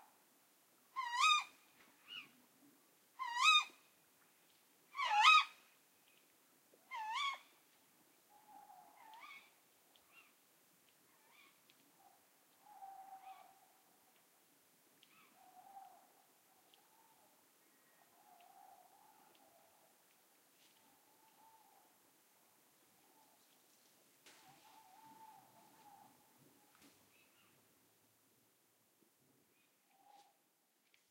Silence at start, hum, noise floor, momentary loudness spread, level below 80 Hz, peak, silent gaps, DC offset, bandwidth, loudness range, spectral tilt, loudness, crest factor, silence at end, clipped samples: 0.95 s; none; -79 dBFS; 31 LU; under -90 dBFS; -16 dBFS; none; under 0.1%; 16 kHz; 28 LU; 2.5 dB/octave; -35 LUFS; 30 dB; 15.3 s; under 0.1%